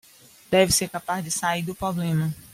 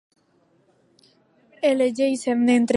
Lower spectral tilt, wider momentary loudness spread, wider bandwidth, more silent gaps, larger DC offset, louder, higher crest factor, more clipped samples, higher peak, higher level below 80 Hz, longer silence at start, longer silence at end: about the same, -4 dB/octave vs -4.5 dB/octave; first, 9 LU vs 4 LU; first, 16.5 kHz vs 11.5 kHz; neither; neither; second, -24 LUFS vs -21 LUFS; about the same, 20 dB vs 16 dB; neither; about the same, -6 dBFS vs -6 dBFS; first, -52 dBFS vs -76 dBFS; second, 0.5 s vs 1.6 s; about the same, 0.1 s vs 0 s